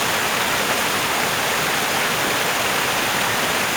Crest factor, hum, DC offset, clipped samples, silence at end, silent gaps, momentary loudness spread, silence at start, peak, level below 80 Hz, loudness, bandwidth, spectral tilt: 14 dB; none; under 0.1%; under 0.1%; 0 s; none; 0 LU; 0 s; -6 dBFS; -50 dBFS; -19 LUFS; over 20 kHz; -1.5 dB/octave